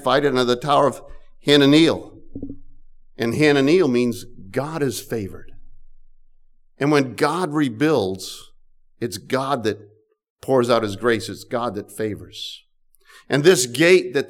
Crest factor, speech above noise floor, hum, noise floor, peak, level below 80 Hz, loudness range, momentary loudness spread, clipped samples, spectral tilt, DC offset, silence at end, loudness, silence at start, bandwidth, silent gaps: 16 dB; 35 dB; none; -54 dBFS; -4 dBFS; -48 dBFS; 6 LU; 18 LU; under 0.1%; -5 dB/octave; under 0.1%; 0 s; -19 LUFS; 0 s; 17 kHz; 10.30-10.36 s